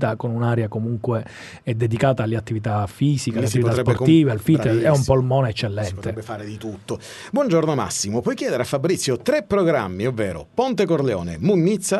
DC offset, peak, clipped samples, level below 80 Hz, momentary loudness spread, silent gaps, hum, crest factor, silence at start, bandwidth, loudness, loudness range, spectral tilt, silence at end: under 0.1%; -2 dBFS; under 0.1%; -48 dBFS; 12 LU; none; none; 18 dB; 0 s; 12 kHz; -21 LUFS; 4 LU; -6 dB/octave; 0 s